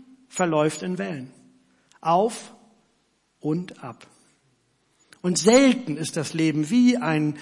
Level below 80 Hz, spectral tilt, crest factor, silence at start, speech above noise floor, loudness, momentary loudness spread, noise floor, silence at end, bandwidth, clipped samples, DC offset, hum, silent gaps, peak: -66 dBFS; -5 dB/octave; 20 dB; 0.35 s; 46 dB; -22 LUFS; 19 LU; -68 dBFS; 0 s; 11.5 kHz; under 0.1%; under 0.1%; none; none; -6 dBFS